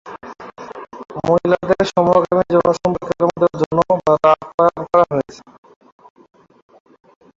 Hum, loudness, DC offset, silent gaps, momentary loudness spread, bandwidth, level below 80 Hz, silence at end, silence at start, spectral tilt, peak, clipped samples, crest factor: none; -16 LUFS; under 0.1%; 3.66-3.71 s, 4.54-4.58 s; 20 LU; 7.6 kHz; -50 dBFS; 2.05 s; 0.05 s; -7 dB/octave; -2 dBFS; under 0.1%; 16 dB